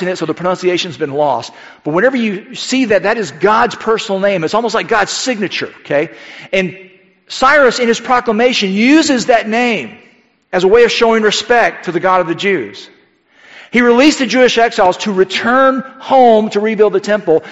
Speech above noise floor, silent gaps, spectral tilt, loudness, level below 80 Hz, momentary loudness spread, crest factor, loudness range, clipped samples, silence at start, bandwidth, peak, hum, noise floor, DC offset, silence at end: 36 dB; none; -4 dB/octave; -12 LUFS; -50 dBFS; 10 LU; 12 dB; 4 LU; under 0.1%; 0 s; 8.2 kHz; 0 dBFS; none; -48 dBFS; 0.2%; 0 s